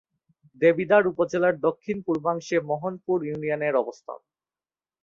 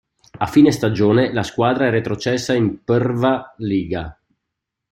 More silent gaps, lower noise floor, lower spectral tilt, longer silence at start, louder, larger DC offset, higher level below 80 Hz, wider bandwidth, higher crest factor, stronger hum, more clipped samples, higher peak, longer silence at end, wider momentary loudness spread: neither; first, under -90 dBFS vs -80 dBFS; about the same, -6.5 dB/octave vs -6.5 dB/octave; first, 0.6 s vs 0.35 s; second, -24 LUFS vs -18 LUFS; neither; second, -68 dBFS vs -48 dBFS; second, 7.4 kHz vs 14.5 kHz; about the same, 20 dB vs 16 dB; neither; neither; second, -6 dBFS vs -2 dBFS; about the same, 0.85 s vs 0.8 s; about the same, 11 LU vs 9 LU